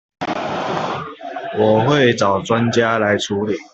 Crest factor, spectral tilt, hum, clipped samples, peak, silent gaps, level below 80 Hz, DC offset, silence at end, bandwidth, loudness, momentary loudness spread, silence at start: 16 dB; -5.5 dB/octave; none; under 0.1%; -2 dBFS; none; -56 dBFS; under 0.1%; 0.05 s; 8.2 kHz; -17 LUFS; 12 LU; 0.2 s